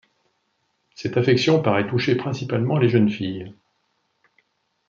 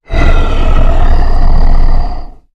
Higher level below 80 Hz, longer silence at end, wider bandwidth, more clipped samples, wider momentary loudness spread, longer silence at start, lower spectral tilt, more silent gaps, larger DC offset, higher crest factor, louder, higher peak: second, -64 dBFS vs -6 dBFS; first, 1.35 s vs 0.25 s; first, 7.6 kHz vs 5.2 kHz; neither; first, 13 LU vs 6 LU; first, 1 s vs 0.1 s; about the same, -7 dB/octave vs -7 dB/octave; neither; neither; first, 18 dB vs 6 dB; second, -21 LUFS vs -14 LUFS; second, -4 dBFS vs 0 dBFS